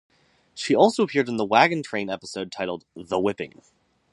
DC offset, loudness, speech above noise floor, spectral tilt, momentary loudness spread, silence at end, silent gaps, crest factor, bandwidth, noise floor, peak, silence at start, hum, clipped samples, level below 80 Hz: under 0.1%; -23 LUFS; 25 dB; -5 dB/octave; 16 LU; 0.65 s; none; 22 dB; 11.5 kHz; -48 dBFS; -2 dBFS; 0.55 s; none; under 0.1%; -64 dBFS